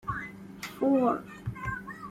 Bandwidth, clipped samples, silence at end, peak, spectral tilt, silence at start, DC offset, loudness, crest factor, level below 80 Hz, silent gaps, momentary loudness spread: 15.5 kHz; under 0.1%; 0 s; -16 dBFS; -7 dB/octave; 0.05 s; under 0.1%; -30 LUFS; 16 dB; -54 dBFS; none; 16 LU